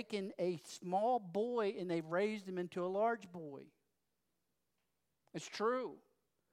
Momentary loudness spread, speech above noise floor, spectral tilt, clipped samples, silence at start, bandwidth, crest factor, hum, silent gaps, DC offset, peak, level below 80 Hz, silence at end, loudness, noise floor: 14 LU; 48 dB; -5.5 dB/octave; under 0.1%; 0 s; 15 kHz; 16 dB; none; none; under 0.1%; -24 dBFS; under -90 dBFS; 0.55 s; -39 LUFS; -87 dBFS